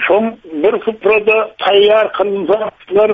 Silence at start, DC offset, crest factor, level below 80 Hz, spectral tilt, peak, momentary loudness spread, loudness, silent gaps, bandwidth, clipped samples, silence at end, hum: 0 s; under 0.1%; 12 dB; -54 dBFS; -6.5 dB/octave; -2 dBFS; 7 LU; -13 LUFS; none; 4.9 kHz; under 0.1%; 0 s; none